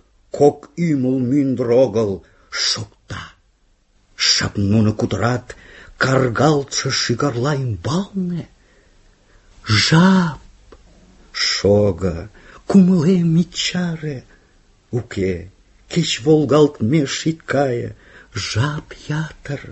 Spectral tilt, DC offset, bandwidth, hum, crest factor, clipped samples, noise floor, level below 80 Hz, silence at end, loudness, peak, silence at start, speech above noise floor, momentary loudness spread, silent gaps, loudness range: -5 dB/octave; under 0.1%; 8.4 kHz; none; 18 dB; under 0.1%; -58 dBFS; -44 dBFS; 0 s; -18 LUFS; 0 dBFS; 0.35 s; 41 dB; 17 LU; none; 3 LU